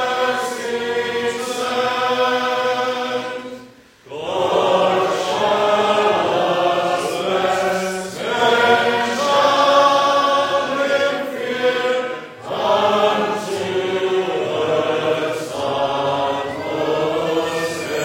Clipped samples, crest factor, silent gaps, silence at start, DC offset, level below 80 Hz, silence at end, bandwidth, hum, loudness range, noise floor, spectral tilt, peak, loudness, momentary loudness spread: under 0.1%; 16 dB; none; 0 s; under 0.1%; -62 dBFS; 0 s; 16.5 kHz; none; 5 LU; -44 dBFS; -3.5 dB/octave; -2 dBFS; -18 LUFS; 9 LU